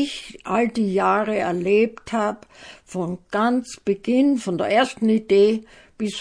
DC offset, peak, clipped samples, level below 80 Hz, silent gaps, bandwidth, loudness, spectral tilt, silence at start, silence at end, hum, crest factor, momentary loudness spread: under 0.1%; -4 dBFS; under 0.1%; -58 dBFS; none; 10.5 kHz; -21 LUFS; -5.5 dB/octave; 0 s; 0 s; none; 18 dB; 11 LU